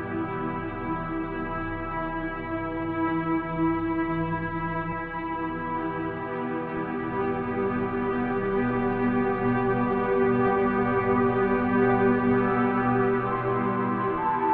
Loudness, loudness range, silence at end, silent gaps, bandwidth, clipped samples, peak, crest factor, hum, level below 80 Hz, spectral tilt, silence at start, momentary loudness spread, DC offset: -26 LUFS; 6 LU; 0 s; none; 4.5 kHz; under 0.1%; -10 dBFS; 14 dB; none; -46 dBFS; -6.5 dB/octave; 0 s; 8 LU; under 0.1%